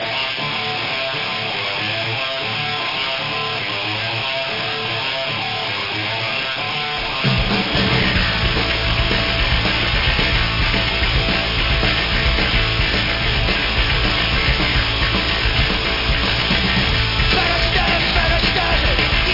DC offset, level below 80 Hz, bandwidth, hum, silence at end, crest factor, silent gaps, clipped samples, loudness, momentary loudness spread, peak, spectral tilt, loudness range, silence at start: 0.2%; -26 dBFS; 5.8 kHz; none; 0 s; 16 dB; none; under 0.1%; -17 LUFS; 5 LU; -2 dBFS; -5 dB/octave; 4 LU; 0 s